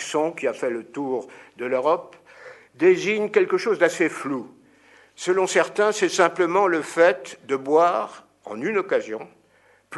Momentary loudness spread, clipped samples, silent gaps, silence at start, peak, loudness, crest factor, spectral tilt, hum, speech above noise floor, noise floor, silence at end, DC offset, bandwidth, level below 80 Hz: 13 LU; under 0.1%; none; 0 s; -4 dBFS; -22 LUFS; 20 dB; -4 dB/octave; none; 37 dB; -59 dBFS; 0 s; under 0.1%; 12 kHz; -76 dBFS